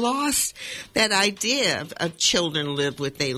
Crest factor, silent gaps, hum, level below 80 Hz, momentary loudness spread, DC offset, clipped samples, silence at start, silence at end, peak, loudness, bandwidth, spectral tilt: 18 dB; none; none; -56 dBFS; 7 LU; under 0.1%; under 0.1%; 0 s; 0 s; -6 dBFS; -22 LUFS; 17.5 kHz; -2 dB/octave